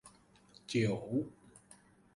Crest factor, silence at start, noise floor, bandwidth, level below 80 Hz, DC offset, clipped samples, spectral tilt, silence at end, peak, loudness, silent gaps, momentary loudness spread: 20 dB; 0.05 s; -63 dBFS; 11.5 kHz; -70 dBFS; under 0.1%; under 0.1%; -6 dB/octave; 0.55 s; -20 dBFS; -36 LUFS; none; 24 LU